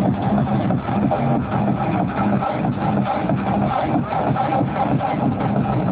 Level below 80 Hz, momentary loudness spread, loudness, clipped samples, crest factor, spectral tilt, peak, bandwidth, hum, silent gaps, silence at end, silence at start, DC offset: -40 dBFS; 2 LU; -20 LUFS; under 0.1%; 12 dB; -12 dB/octave; -6 dBFS; 4 kHz; none; none; 0 s; 0 s; under 0.1%